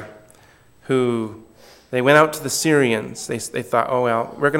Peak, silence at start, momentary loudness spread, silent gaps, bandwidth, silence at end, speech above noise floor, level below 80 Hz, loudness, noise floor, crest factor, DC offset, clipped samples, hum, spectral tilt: 0 dBFS; 0 s; 12 LU; none; 17 kHz; 0 s; 33 dB; -62 dBFS; -19 LUFS; -51 dBFS; 20 dB; under 0.1%; under 0.1%; none; -4.5 dB/octave